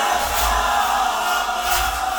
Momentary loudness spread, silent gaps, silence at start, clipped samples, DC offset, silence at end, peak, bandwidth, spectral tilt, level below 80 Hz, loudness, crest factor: 2 LU; none; 0 s; under 0.1%; 0.1%; 0 s; -4 dBFS; over 20 kHz; -1.5 dB/octave; -34 dBFS; -19 LUFS; 16 dB